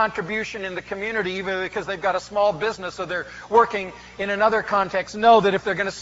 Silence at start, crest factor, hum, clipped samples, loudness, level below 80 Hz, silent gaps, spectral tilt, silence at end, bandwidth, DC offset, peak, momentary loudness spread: 0 s; 18 dB; none; under 0.1%; -22 LUFS; -54 dBFS; none; -2.5 dB/octave; 0 s; 8 kHz; under 0.1%; -4 dBFS; 13 LU